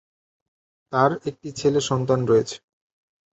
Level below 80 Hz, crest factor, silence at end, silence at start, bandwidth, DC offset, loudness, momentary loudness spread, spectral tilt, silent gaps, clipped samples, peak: -58 dBFS; 20 dB; 0.75 s; 0.9 s; 8.2 kHz; under 0.1%; -22 LUFS; 12 LU; -5.5 dB/octave; none; under 0.1%; -4 dBFS